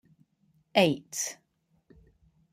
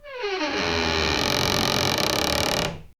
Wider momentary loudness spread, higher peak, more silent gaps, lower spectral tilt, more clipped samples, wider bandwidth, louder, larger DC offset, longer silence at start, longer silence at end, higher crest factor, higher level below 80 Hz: first, 12 LU vs 5 LU; second, -6 dBFS vs -2 dBFS; neither; about the same, -3.5 dB/octave vs -3 dB/octave; neither; second, 15.5 kHz vs over 20 kHz; second, -28 LUFS vs -22 LUFS; neither; first, 0.75 s vs 0.05 s; first, 1.2 s vs 0.1 s; about the same, 26 dB vs 22 dB; second, -70 dBFS vs -40 dBFS